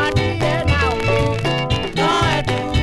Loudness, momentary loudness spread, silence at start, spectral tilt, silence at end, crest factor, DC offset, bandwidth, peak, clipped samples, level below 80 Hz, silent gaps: -18 LUFS; 3 LU; 0 s; -5.5 dB/octave; 0 s; 14 dB; under 0.1%; 12.5 kHz; -4 dBFS; under 0.1%; -28 dBFS; none